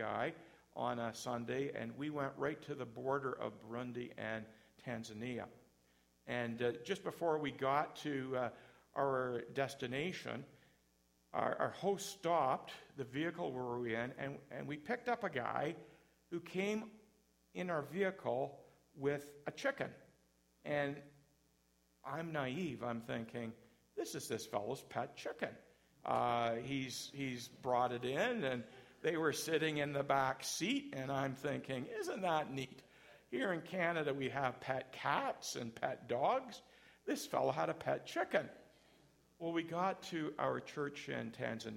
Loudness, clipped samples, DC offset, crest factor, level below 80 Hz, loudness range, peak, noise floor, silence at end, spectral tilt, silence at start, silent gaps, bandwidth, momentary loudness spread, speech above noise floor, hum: -41 LUFS; under 0.1%; under 0.1%; 22 dB; -76 dBFS; 6 LU; -18 dBFS; -75 dBFS; 0 s; -5 dB/octave; 0 s; none; 16.5 kHz; 11 LU; 35 dB; none